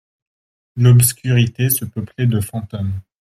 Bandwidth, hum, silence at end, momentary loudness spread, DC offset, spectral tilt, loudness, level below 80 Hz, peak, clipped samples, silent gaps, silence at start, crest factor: 15 kHz; none; 0.2 s; 14 LU; under 0.1%; -5.5 dB/octave; -16 LUFS; -48 dBFS; 0 dBFS; under 0.1%; none; 0.75 s; 16 dB